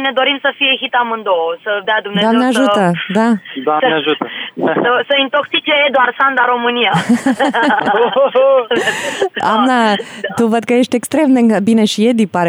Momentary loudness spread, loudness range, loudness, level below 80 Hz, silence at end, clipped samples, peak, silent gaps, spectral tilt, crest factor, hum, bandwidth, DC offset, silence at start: 5 LU; 2 LU; -13 LUFS; -66 dBFS; 0 s; under 0.1%; -2 dBFS; none; -4.5 dB/octave; 10 dB; none; over 20 kHz; under 0.1%; 0 s